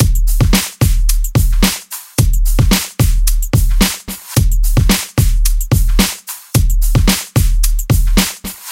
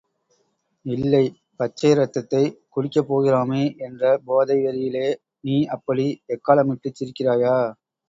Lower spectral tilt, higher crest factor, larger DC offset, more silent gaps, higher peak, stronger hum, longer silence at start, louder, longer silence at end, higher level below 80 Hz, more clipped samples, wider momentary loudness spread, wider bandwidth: second, -4.5 dB/octave vs -7.5 dB/octave; second, 12 dB vs 20 dB; neither; neither; about the same, 0 dBFS vs -2 dBFS; neither; second, 0 s vs 0.85 s; first, -15 LUFS vs -22 LUFS; second, 0 s vs 0.35 s; first, -14 dBFS vs -62 dBFS; neither; second, 4 LU vs 9 LU; first, 17 kHz vs 7.8 kHz